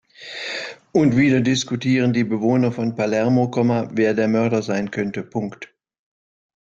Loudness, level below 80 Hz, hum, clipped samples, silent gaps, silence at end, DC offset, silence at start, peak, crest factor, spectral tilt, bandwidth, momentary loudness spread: -20 LUFS; -60 dBFS; none; under 0.1%; none; 0.95 s; under 0.1%; 0.2 s; -4 dBFS; 16 dB; -6 dB/octave; 7.8 kHz; 12 LU